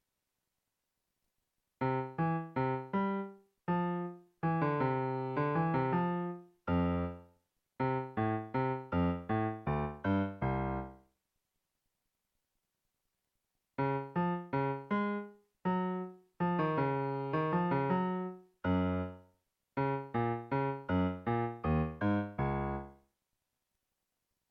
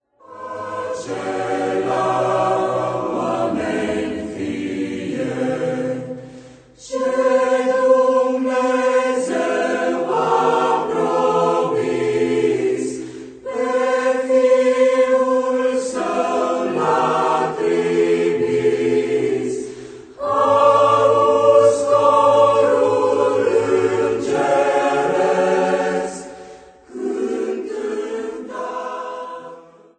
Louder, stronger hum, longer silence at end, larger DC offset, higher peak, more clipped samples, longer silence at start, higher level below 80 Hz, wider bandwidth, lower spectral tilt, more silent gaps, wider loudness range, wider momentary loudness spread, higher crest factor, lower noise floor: second, -35 LUFS vs -18 LUFS; neither; first, 1.55 s vs 0.4 s; neither; second, -20 dBFS vs -2 dBFS; neither; first, 1.8 s vs 0.3 s; about the same, -56 dBFS vs -58 dBFS; second, 5.2 kHz vs 9.2 kHz; first, -10 dB/octave vs -5 dB/octave; neither; second, 5 LU vs 8 LU; second, 9 LU vs 14 LU; about the same, 16 dB vs 16 dB; first, -86 dBFS vs -42 dBFS